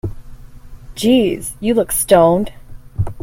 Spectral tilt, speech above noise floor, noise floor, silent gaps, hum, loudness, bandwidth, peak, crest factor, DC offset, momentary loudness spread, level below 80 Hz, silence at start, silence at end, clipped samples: -5 dB/octave; 21 dB; -35 dBFS; none; none; -15 LUFS; 16.5 kHz; 0 dBFS; 16 dB; under 0.1%; 18 LU; -36 dBFS; 0.05 s; 0.05 s; under 0.1%